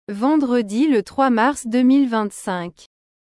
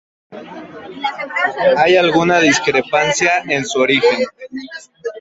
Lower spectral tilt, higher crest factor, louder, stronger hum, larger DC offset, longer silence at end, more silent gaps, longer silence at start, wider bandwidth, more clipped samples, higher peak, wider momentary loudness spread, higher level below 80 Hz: first, -5 dB/octave vs -3.5 dB/octave; about the same, 12 dB vs 16 dB; second, -18 LUFS vs -14 LUFS; neither; neither; first, 0.5 s vs 0 s; neither; second, 0.1 s vs 0.3 s; first, 12 kHz vs 8 kHz; neither; second, -6 dBFS vs 0 dBFS; second, 11 LU vs 21 LU; about the same, -60 dBFS vs -56 dBFS